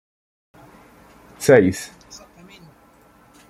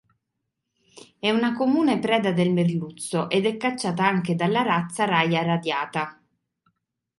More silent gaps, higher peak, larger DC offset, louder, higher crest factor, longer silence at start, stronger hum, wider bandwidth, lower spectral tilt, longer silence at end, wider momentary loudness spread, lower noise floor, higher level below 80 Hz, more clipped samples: neither; first, -2 dBFS vs -6 dBFS; neither; first, -17 LUFS vs -23 LUFS; about the same, 22 dB vs 18 dB; first, 1.4 s vs 0.95 s; neither; first, 15.5 kHz vs 11.5 kHz; about the same, -5.5 dB/octave vs -5.5 dB/octave; first, 1.65 s vs 1.05 s; first, 28 LU vs 7 LU; second, -52 dBFS vs -80 dBFS; first, -58 dBFS vs -68 dBFS; neither